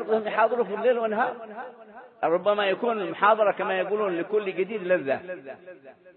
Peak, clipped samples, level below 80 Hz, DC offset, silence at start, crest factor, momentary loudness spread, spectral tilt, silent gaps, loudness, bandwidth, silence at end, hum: -8 dBFS; under 0.1%; -82 dBFS; under 0.1%; 0 s; 18 dB; 16 LU; -9 dB/octave; none; -25 LUFS; 4.3 kHz; 0.05 s; none